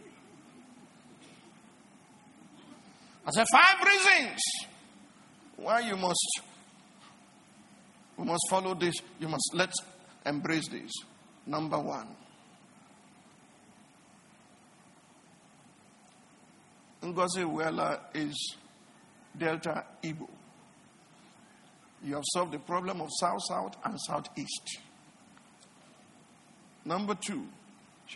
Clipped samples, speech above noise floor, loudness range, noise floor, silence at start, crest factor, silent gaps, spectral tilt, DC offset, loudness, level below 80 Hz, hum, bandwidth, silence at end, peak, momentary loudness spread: under 0.1%; 29 dB; 15 LU; -60 dBFS; 0 s; 28 dB; none; -2.5 dB/octave; under 0.1%; -30 LUFS; -78 dBFS; none; 11.5 kHz; 0 s; -6 dBFS; 21 LU